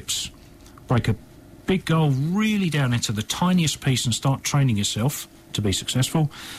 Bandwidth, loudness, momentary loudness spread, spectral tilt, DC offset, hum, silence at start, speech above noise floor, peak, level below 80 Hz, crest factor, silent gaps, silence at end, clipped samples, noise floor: 15.5 kHz; -23 LUFS; 7 LU; -4.5 dB/octave; under 0.1%; none; 0 s; 24 dB; -10 dBFS; -48 dBFS; 12 dB; none; 0 s; under 0.1%; -46 dBFS